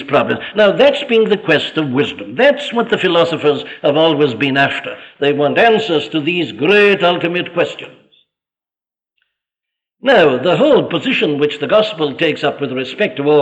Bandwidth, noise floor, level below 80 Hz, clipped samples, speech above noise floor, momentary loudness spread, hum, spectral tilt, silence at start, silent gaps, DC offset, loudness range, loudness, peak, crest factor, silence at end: 8.6 kHz; under -90 dBFS; -58 dBFS; under 0.1%; over 76 dB; 8 LU; none; -6 dB/octave; 0 s; none; under 0.1%; 3 LU; -14 LUFS; -2 dBFS; 14 dB; 0 s